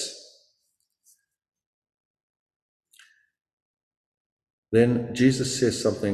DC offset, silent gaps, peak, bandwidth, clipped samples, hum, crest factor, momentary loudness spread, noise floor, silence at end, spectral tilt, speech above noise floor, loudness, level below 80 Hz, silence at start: under 0.1%; 1.66-1.82 s, 1.94-2.14 s, 2.23-2.46 s, 2.56-2.80 s, 3.53-3.74 s, 3.83-3.91 s, 3.97-4.37 s, 4.53-4.63 s; -6 dBFS; 13.5 kHz; under 0.1%; none; 22 dB; 9 LU; -76 dBFS; 0 s; -5.5 dB/octave; 54 dB; -23 LUFS; -58 dBFS; 0 s